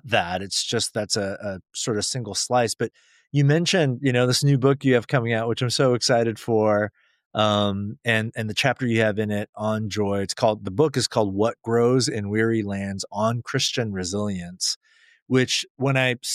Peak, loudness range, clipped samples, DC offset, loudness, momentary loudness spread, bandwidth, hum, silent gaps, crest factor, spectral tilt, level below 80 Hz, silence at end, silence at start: -6 dBFS; 4 LU; under 0.1%; under 0.1%; -23 LUFS; 8 LU; 14.5 kHz; none; 7.26-7.31 s, 9.49-9.53 s, 14.76-14.81 s, 15.22-15.26 s, 15.70-15.75 s; 18 dB; -4.5 dB/octave; -62 dBFS; 0 s; 0.05 s